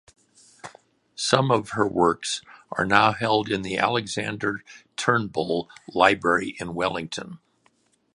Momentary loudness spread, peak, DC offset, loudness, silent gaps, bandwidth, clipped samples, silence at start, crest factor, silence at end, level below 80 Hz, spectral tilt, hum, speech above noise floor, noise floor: 17 LU; 0 dBFS; under 0.1%; -23 LUFS; none; 11.5 kHz; under 0.1%; 0.65 s; 24 dB; 0.8 s; -58 dBFS; -4 dB/octave; none; 42 dB; -65 dBFS